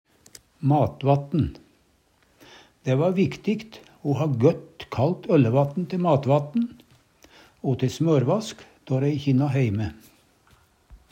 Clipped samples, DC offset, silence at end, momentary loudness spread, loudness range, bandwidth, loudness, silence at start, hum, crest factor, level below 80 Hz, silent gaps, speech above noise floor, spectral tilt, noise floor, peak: under 0.1%; under 0.1%; 0.15 s; 11 LU; 3 LU; 9.2 kHz; -24 LUFS; 0.6 s; none; 20 dB; -56 dBFS; none; 41 dB; -8 dB/octave; -63 dBFS; -4 dBFS